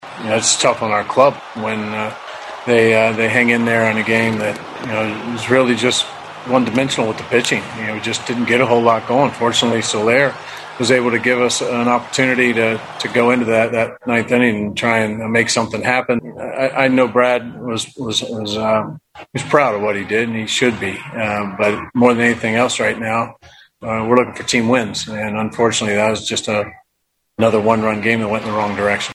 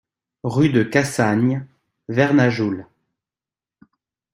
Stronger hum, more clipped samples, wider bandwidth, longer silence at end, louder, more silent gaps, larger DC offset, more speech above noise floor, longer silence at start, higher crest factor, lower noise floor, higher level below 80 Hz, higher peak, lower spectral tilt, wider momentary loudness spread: neither; neither; second, 14 kHz vs 15.5 kHz; second, 0 s vs 1.5 s; first, -16 LUFS vs -19 LUFS; neither; neither; second, 53 dB vs over 72 dB; second, 0 s vs 0.45 s; about the same, 16 dB vs 18 dB; second, -70 dBFS vs under -90 dBFS; about the same, -54 dBFS vs -58 dBFS; about the same, 0 dBFS vs -2 dBFS; second, -4 dB/octave vs -6.5 dB/octave; about the same, 9 LU vs 11 LU